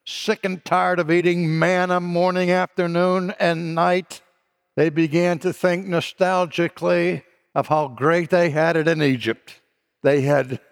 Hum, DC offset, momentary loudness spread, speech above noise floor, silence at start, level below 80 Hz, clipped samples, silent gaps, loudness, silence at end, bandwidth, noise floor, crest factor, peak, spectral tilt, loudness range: none; under 0.1%; 6 LU; 48 dB; 0.05 s; -70 dBFS; under 0.1%; none; -20 LUFS; 0.15 s; 16 kHz; -67 dBFS; 16 dB; -4 dBFS; -6.5 dB/octave; 2 LU